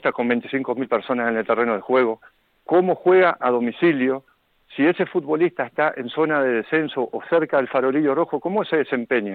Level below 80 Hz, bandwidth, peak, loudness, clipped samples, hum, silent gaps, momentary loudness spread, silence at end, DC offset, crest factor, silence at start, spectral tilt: -70 dBFS; 4.5 kHz; -4 dBFS; -21 LUFS; under 0.1%; none; none; 6 LU; 0 s; under 0.1%; 16 dB; 0.05 s; -9 dB/octave